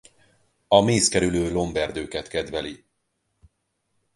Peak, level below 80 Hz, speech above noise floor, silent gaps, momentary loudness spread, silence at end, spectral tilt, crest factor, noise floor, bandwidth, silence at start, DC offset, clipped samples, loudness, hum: -2 dBFS; -46 dBFS; 52 dB; none; 13 LU; 1.4 s; -4 dB/octave; 24 dB; -74 dBFS; 11.5 kHz; 0.7 s; under 0.1%; under 0.1%; -22 LUFS; none